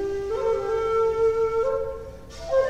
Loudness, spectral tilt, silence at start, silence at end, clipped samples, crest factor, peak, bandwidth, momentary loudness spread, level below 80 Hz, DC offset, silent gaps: -24 LUFS; -5.5 dB/octave; 0 s; 0 s; under 0.1%; 12 dB; -12 dBFS; 8.8 kHz; 15 LU; -44 dBFS; under 0.1%; none